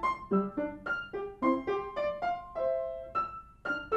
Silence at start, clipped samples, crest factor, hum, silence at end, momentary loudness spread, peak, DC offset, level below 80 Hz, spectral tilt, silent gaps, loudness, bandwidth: 0 s; under 0.1%; 18 dB; none; 0 s; 6 LU; -16 dBFS; under 0.1%; -58 dBFS; -7.5 dB/octave; none; -34 LUFS; 8.2 kHz